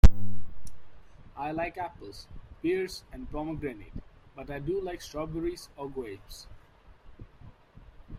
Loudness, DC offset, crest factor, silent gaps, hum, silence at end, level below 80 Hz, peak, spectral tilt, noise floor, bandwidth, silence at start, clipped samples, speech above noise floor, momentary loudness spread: -35 LUFS; under 0.1%; 24 dB; none; none; 0 s; -34 dBFS; -2 dBFS; -7 dB/octave; -55 dBFS; 16.5 kHz; 0.05 s; under 0.1%; 20 dB; 21 LU